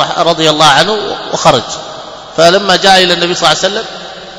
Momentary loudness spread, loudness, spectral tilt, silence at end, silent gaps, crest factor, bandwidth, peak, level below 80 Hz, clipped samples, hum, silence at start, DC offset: 16 LU; -8 LUFS; -3 dB/octave; 0 s; none; 10 dB; 11 kHz; 0 dBFS; -42 dBFS; 2%; none; 0 s; under 0.1%